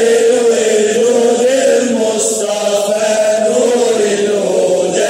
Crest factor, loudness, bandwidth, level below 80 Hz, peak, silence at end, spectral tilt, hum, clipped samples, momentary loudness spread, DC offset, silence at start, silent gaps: 10 dB; -12 LUFS; 16 kHz; -68 dBFS; -2 dBFS; 0 s; -3 dB/octave; none; under 0.1%; 3 LU; under 0.1%; 0 s; none